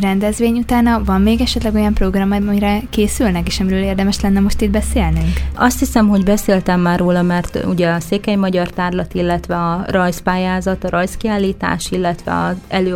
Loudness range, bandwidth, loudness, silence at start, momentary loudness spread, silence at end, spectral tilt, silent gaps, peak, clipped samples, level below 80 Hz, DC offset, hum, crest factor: 3 LU; 17 kHz; -16 LUFS; 0 s; 5 LU; 0 s; -6 dB/octave; none; 0 dBFS; under 0.1%; -26 dBFS; under 0.1%; none; 14 dB